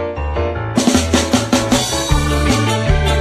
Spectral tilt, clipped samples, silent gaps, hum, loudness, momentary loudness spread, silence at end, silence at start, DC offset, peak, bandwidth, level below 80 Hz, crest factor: -4.5 dB/octave; under 0.1%; none; none; -15 LUFS; 6 LU; 0 s; 0 s; under 0.1%; 0 dBFS; 14 kHz; -22 dBFS; 14 dB